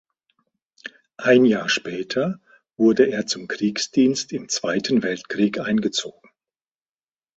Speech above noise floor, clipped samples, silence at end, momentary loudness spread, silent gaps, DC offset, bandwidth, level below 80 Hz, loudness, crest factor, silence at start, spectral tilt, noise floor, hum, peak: over 69 dB; under 0.1%; 1.3 s; 16 LU; none; under 0.1%; 8.2 kHz; -64 dBFS; -21 LUFS; 20 dB; 0.85 s; -4 dB/octave; under -90 dBFS; none; -2 dBFS